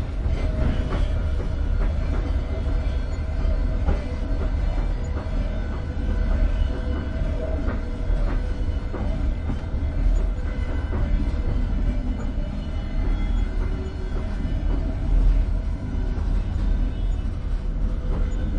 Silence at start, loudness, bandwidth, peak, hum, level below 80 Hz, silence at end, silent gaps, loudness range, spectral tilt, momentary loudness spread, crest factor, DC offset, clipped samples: 0 s; -27 LUFS; 7.2 kHz; -10 dBFS; none; -24 dBFS; 0 s; none; 1 LU; -8 dB/octave; 4 LU; 14 dB; under 0.1%; under 0.1%